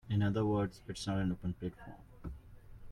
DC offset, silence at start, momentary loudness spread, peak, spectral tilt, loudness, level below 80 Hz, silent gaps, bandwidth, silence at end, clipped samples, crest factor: under 0.1%; 0.05 s; 20 LU; -20 dBFS; -7 dB/octave; -36 LUFS; -54 dBFS; none; 11.5 kHz; 0 s; under 0.1%; 16 dB